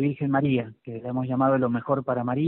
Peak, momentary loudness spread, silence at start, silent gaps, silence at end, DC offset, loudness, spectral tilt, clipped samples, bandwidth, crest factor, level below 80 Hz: -10 dBFS; 9 LU; 0 s; none; 0 s; under 0.1%; -25 LUFS; -7.5 dB/octave; under 0.1%; 4 kHz; 16 dB; -62 dBFS